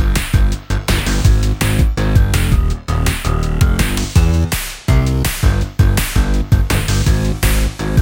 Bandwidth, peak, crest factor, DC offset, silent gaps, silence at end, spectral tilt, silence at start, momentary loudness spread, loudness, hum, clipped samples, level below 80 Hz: 17 kHz; 0 dBFS; 14 dB; under 0.1%; none; 0 s; -5 dB/octave; 0 s; 4 LU; -16 LUFS; none; under 0.1%; -16 dBFS